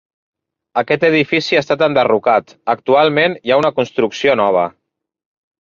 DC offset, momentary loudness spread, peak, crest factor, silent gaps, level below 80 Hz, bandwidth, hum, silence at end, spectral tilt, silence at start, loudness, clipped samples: under 0.1%; 7 LU; 0 dBFS; 16 dB; none; -58 dBFS; 7.4 kHz; none; 0.9 s; -5.5 dB/octave; 0.75 s; -15 LUFS; under 0.1%